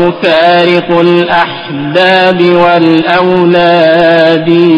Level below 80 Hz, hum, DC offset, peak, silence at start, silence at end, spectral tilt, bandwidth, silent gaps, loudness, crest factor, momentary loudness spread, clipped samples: -46 dBFS; none; under 0.1%; 0 dBFS; 0 s; 0 s; -7 dB/octave; 7 kHz; none; -7 LUFS; 6 dB; 4 LU; 2%